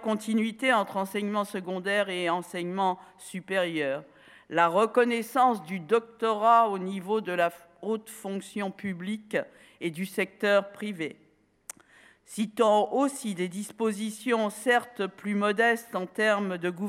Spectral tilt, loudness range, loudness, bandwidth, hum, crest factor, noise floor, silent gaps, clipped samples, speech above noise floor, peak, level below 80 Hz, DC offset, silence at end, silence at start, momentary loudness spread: -4.5 dB/octave; 6 LU; -28 LUFS; 16.5 kHz; none; 20 dB; -58 dBFS; none; under 0.1%; 30 dB; -8 dBFS; -78 dBFS; under 0.1%; 0 s; 0 s; 13 LU